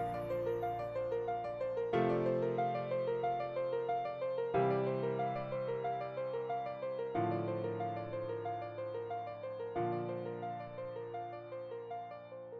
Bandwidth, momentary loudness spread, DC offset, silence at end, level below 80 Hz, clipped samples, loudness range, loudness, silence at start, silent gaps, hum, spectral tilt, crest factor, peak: 11.5 kHz; 10 LU; under 0.1%; 0 s; -68 dBFS; under 0.1%; 6 LU; -38 LUFS; 0 s; none; none; -9 dB/octave; 16 dB; -22 dBFS